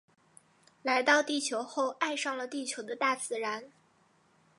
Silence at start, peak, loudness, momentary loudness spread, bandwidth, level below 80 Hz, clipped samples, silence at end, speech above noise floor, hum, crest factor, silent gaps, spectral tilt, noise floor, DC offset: 0.85 s; -12 dBFS; -31 LUFS; 11 LU; 11 kHz; -88 dBFS; under 0.1%; 0.9 s; 36 dB; none; 22 dB; none; -1 dB/octave; -67 dBFS; under 0.1%